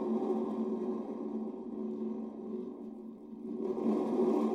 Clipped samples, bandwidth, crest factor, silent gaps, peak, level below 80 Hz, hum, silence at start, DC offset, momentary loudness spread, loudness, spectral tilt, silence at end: under 0.1%; 7.4 kHz; 14 dB; none; -20 dBFS; -78 dBFS; none; 0 s; under 0.1%; 14 LU; -36 LUFS; -9 dB/octave; 0 s